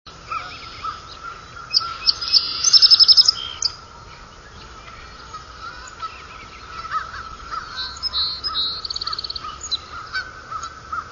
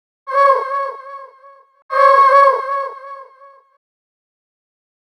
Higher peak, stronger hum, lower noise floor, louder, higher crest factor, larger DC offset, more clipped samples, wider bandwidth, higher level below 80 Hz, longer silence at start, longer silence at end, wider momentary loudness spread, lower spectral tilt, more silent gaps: about the same, 0 dBFS vs 0 dBFS; neither; second, -41 dBFS vs -46 dBFS; second, -16 LUFS vs -13 LUFS; about the same, 22 dB vs 18 dB; neither; neither; second, 7.4 kHz vs 10 kHz; first, -48 dBFS vs under -90 dBFS; second, 0.05 s vs 0.25 s; second, 0 s vs 1.85 s; about the same, 26 LU vs 25 LU; about the same, 1 dB/octave vs 1 dB/octave; second, none vs 1.82-1.89 s